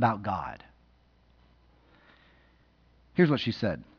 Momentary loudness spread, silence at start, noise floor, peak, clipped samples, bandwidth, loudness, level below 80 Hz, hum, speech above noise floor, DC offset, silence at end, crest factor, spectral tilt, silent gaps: 15 LU; 0 s; -63 dBFS; -10 dBFS; under 0.1%; 5.4 kHz; -29 LUFS; -60 dBFS; none; 35 dB; under 0.1%; 0.15 s; 22 dB; -8 dB/octave; none